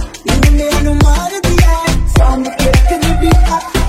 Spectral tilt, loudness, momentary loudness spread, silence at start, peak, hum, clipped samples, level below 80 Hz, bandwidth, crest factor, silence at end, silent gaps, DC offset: -5.5 dB/octave; -12 LUFS; 3 LU; 0 s; 0 dBFS; none; under 0.1%; -12 dBFS; 15.5 kHz; 10 dB; 0 s; none; under 0.1%